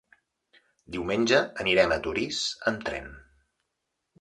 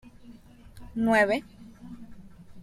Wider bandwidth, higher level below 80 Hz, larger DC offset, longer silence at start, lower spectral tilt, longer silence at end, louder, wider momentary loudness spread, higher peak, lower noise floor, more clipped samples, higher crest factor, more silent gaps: second, 11 kHz vs 14 kHz; about the same, -54 dBFS vs -54 dBFS; neither; first, 0.9 s vs 0.3 s; second, -3.5 dB/octave vs -5.5 dB/octave; first, 1 s vs 0 s; about the same, -26 LUFS vs -25 LUFS; second, 14 LU vs 24 LU; about the same, -8 dBFS vs -10 dBFS; first, -81 dBFS vs -50 dBFS; neither; about the same, 22 dB vs 20 dB; neither